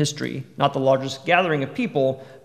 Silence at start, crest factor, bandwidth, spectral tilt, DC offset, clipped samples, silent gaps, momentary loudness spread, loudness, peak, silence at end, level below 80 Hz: 0 s; 20 dB; 14.5 kHz; -5 dB/octave; 0.1%; under 0.1%; none; 6 LU; -22 LUFS; -2 dBFS; 0.05 s; -68 dBFS